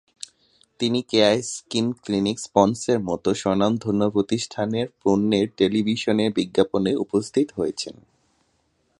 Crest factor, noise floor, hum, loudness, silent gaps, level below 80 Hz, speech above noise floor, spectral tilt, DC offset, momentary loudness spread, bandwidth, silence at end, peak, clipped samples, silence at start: 20 dB; -68 dBFS; none; -22 LUFS; none; -56 dBFS; 46 dB; -5 dB/octave; under 0.1%; 7 LU; 11.5 kHz; 1.05 s; -2 dBFS; under 0.1%; 0.8 s